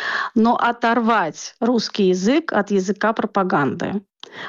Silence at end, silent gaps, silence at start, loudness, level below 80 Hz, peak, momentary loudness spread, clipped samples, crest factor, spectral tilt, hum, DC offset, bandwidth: 0 s; none; 0 s; -19 LUFS; -62 dBFS; -8 dBFS; 9 LU; under 0.1%; 12 dB; -5.5 dB/octave; none; under 0.1%; 7.6 kHz